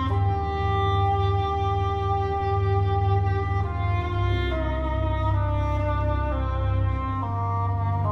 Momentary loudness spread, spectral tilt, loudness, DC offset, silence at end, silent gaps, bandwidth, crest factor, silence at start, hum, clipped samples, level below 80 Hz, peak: 4 LU; -8.5 dB/octave; -25 LUFS; under 0.1%; 0 s; none; 5.8 kHz; 12 dB; 0 s; none; under 0.1%; -30 dBFS; -12 dBFS